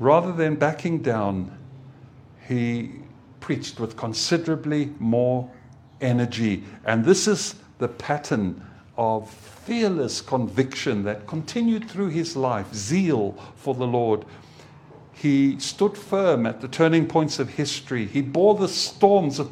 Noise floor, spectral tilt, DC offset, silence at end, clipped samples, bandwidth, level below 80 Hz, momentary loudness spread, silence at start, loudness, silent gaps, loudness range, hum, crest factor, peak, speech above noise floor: -47 dBFS; -5.5 dB/octave; under 0.1%; 0 s; under 0.1%; 15 kHz; -62 dBFS; 11 LU; 0 s; -23 LUFS; none; 5 LU; none; 22 dB; -2 dBFS; 25 dB